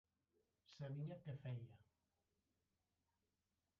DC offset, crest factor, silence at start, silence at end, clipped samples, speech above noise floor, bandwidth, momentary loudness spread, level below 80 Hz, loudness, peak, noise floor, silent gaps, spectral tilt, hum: under 0.1%; 16 dB; 0.7 s; 1.95 s; under 0.1%; over 39 dB; 6.4 kHz; 11 LU; -84 dBFS; -53 LUFS; -40 dBFS; under -90 dBFS; none; -8 dB/octave; none